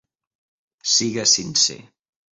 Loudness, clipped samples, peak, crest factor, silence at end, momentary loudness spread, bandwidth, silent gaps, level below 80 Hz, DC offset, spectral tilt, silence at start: -17 LUFS; under 0.1%; -4 dBFS; 20 dB; 0.55 s; 4 LU; 8 kHz; none; -64 dBFS; under 0.1%; -1 dB/octave; 0.85 s